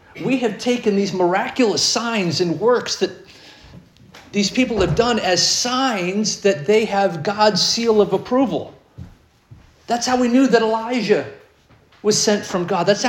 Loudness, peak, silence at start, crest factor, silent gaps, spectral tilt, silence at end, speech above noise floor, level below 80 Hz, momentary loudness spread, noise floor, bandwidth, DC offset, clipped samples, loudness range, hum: -18 LUFS; -2 dBFS; 0.15 s; 18 dB; none; -3.5 dB/octave; 0 s; 34 dB; -48 dBFS; 7 LU; -52 dBFS; 17 kHz; under 0.1%; under 0.1%; 3 LU; none